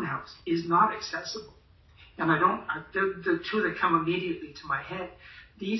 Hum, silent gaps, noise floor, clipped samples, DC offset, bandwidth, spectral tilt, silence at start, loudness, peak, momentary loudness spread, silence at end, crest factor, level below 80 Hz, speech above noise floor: none; none; -56 dBFS; under 0.1%; under 0.1%; 6.2 kHz; -5.5 dB/octave; 0 s; -28 LUFS; -10 dBFS; 14 LU; 0 s; 20 dB; -60 dBFS; 27 dB